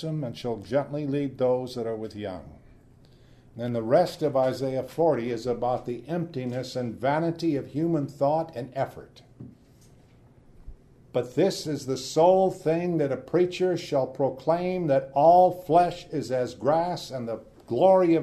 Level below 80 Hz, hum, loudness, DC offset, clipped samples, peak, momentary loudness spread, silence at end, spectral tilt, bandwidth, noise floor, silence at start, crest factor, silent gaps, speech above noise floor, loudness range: -58 dBFS; none; -26 LUFS; under 0.1%; under 0.1%; -8 dBFS; 12 LU; 0 s; -6.5 dB/octave; 13.5 kHz; -55 dBFS; 0 s; 18 dB; none; 30 dB; 8 LU